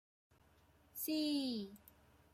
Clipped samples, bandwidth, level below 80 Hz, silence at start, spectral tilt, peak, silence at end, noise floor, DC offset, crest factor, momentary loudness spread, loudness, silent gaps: under 0.1%; 16 kHz; -76 dBFS; 0.95 s; -3.5 dB/octave; -30 dBFS; 0.55 s; -70 dBFS; under 0.1%; 14 dB; 16 LU; -40 LUFS; none